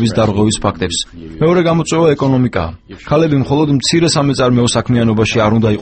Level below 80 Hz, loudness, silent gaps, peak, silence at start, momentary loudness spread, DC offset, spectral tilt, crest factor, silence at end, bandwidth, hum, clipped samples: -36 dBFS; -13 LUFS; none; 0 dBFS; 0 s; 6 LU; under 0.1%; -5.5 dB/octave; 12 dB; 0 s; 9 kHz; none; under 0.1%